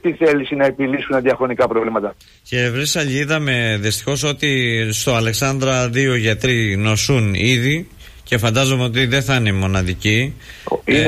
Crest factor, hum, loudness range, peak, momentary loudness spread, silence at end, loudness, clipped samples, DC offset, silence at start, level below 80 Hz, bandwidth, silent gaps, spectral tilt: 12 dB; none; 2 LU; -6 dBFS; 5 LU; 0 s; -17 LUFS; under 0.1%; under 0.1%; 0.05 s; -40 dBFS; 15.5 kHz; none; -4.5 dB/octave